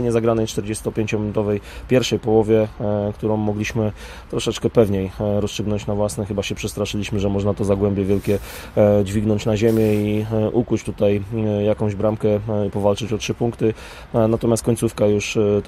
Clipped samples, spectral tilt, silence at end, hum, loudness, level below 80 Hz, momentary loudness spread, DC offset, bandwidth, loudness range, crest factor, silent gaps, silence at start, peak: under 0.1%; -6.5 dB/octave; 0 s; none; -20 LUFS; -40 dBFS; 7 LU; under 0.1%; 15.5 kHz; 3 LU; 18 dB; none; 0 s; -2 dBFS